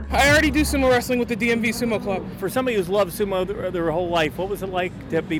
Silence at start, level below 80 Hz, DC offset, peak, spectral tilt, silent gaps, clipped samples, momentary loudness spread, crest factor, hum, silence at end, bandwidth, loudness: 0 s; -36 dBFS; under 0.1%; -6 dBFS; -4.5 dB/octave; none; under 0.1%; 9 LU; 16 dB; none; 0 s; 19 kHz; -21 LUFS